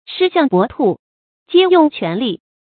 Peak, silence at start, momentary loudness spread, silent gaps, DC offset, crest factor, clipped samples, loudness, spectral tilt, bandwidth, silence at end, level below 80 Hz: 0 dBFS; 0.1 s; 9 LU; 0.99-1.46 s; under 0.1%; 14 dB; under 0.1%; -15 LUFS; -11 dB/octave; 4.6 kHz; 0.25 s; -56 dBFS